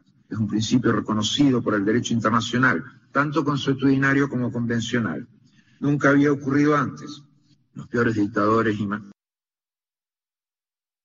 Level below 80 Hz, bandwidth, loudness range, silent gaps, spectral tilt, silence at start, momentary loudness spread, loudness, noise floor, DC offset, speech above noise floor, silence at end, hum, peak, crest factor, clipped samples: -58 dBFS; 7.8 kHz; 5 LU; none; -5 dB/octave; 0.3 s; 10 LU; -22 LUFS; under -90 dBFS; under 0.1%; over 69 dB; 1.9 s; none; -6 dBFS; 16 dB; under 0.1%